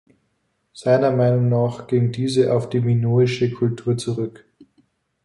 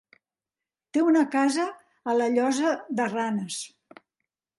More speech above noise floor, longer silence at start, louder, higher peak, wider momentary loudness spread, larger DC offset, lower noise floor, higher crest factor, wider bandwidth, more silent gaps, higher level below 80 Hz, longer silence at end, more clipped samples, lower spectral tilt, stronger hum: second, 51 dB vs over 66 dB; second, 0.75 s vs 0.95 s; first, -20 LUFS vs -25 LUFS; first, -4 dBFS vs -12 dBFS; second, 7 LU vs 12 LU; neither; second, -70 dBFS vs under -90 dBFS; about the same, 16 dB vs 16 dB; about the same, 11.5 kHz vs 11.5 kHz; neither; first, -58 dBFS vs -78 dBFS; about the same, 0.95 s vs 0.9 s; neither; first, -7.5 dB/octave vs -4.5 dB/octave; neither